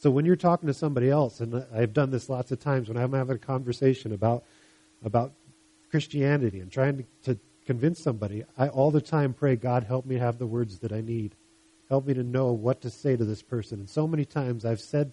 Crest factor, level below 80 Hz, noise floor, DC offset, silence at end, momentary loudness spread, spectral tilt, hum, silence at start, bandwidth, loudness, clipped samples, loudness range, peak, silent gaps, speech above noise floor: 18 dB; -62 dBFS; -61 dBFS; under 0.1%; 0 s; 9 LU; -8 dB/octave; none; 0 s; 11 kHz; -28 LUFS; under 0.1%; 2 LU; -10 dBFS; none; 34 dB